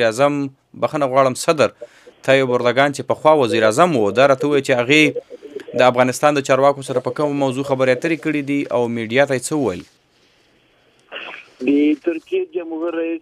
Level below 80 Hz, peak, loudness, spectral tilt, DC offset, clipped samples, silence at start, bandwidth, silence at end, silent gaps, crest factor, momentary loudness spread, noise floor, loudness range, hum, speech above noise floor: -66 dBFS; 0 dBFS; -17 LUFS; -5 dB/octave; under 0.1%; under 0.1%; 0 s; 14.5 kHz; 0.05 s; none; 18 dB; 12 LU; -57 dBFS; 7 LU; none; 40 dB